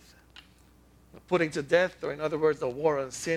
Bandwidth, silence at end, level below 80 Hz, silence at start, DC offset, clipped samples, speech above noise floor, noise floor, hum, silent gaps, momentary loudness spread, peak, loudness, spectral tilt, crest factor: 13.5 kHz; 0 s; -60 dBFS; 1.15 s; under 0.1%; under 0.1%; 31 dB; -58 dBFS; none; none; 6 LU; -8 dBFS; -28 LUFS; -5 dB/octave; 20 dB